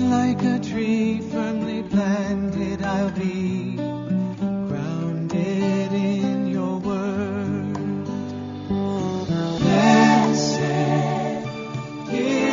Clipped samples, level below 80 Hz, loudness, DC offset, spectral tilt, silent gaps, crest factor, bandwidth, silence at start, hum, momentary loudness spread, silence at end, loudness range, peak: under 0.1%; -52 dBFS; -23 LUFS; under 0.1%; -6 dB/octave; none; 18 dB; 7.4 kHz; 0 s; none; 9 LU; 0 s; 5 LU; -4 dBFS